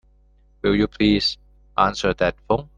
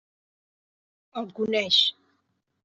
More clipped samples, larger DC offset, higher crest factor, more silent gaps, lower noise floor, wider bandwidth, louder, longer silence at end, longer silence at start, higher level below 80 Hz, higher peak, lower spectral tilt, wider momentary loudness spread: neither; neither; about the same, 20 dB vs 22 dB; neither; second, -55 dBFS vs -74 dBFS; first, 9.4 kHz vs 8.2 kHz; about the same, -21 LUFS vs -22 LUFS; second, 0.1 s vs 0.75 s; second, 0.65 s vs 1.15 s; first, -40 dBFS vs -76 dBFS; first, -2 dBFS vs -8 dBFS; first, -5.5 dB/octave vs -3 dB/octave; second, 8 LU vs 16 LU